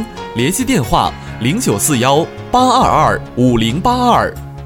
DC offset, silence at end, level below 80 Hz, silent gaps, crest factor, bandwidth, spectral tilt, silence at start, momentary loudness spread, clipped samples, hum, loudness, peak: under 0.1%; 0 s; -32 dBFS; none; 14 dB; 18 kHz; -4.5 dB/octave; 0 s; 7 LU; under 0.1%; none; -14 LUFS; 0 dBFS